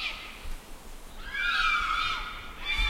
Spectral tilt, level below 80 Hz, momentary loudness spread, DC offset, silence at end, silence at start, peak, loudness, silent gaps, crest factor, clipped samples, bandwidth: -1.5 dB/octave; -40 dBFS; 22 LU; under 0.1%; 0 s; 0 s; -16 dBFS; -29 LUFS; none; 16 dB; under 0.1%; 16 kHz